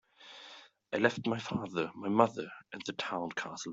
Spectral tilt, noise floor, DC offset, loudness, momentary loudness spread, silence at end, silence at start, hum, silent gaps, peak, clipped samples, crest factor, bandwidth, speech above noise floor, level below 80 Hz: -5 dB/octave; -55 dBFS; under 0.1%; -34 LUFS; 21 LU; 0 s; 0.2 s; none; none; -10 dBFS; under 0.1%; 26 dB; 8 kHz; 22 dB; -72 dBFS